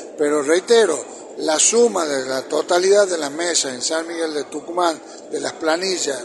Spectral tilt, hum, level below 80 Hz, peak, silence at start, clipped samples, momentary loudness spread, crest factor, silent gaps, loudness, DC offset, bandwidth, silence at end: -1.5 dB/octave; none; -72 dBFS; 0 dBFS; 0 s; under 0.1%; 12 LU; 18 dB; none; -19 LUFS; under 0.1%; 11.5 kHz; 0 s